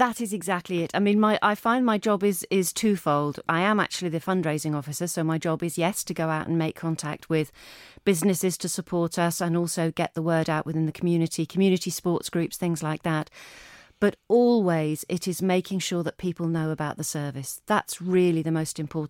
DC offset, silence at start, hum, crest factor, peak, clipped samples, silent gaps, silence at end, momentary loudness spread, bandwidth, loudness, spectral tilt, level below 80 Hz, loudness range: under 0.1%; 0 s; none; 18 dB; -8 dBFS; under 0.1%; none; 0 s; 7 LU; 17 kHz; -26 LUFS; -5 dB/octave; -64 dBFS; 4 LU